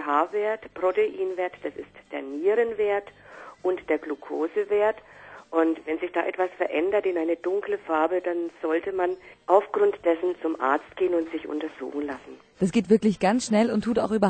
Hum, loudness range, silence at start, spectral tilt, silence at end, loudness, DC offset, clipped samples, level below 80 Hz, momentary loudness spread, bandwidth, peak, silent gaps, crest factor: none; 3 LU; 0 s; -6 dB/octave; 0 s; -26 LUFS; under 0.1%; under 0.1%; -62 dBFS; 12 LU; 9.2 kHz; -4 dBFS; none; 20 dB